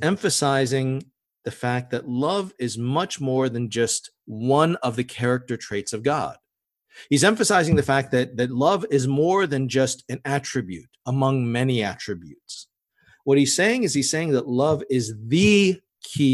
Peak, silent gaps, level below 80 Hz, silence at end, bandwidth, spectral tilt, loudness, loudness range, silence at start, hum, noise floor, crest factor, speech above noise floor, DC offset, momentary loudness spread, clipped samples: -4 dBFS; none; -54 dBFS; 0 s; 13 kHz; -5 dB/octave; -22 LUFS; 5 LU; 0 s; none; -81 dBFS; 20 dB; 59 dB; under 0.1%; 13 LU; under 0.1%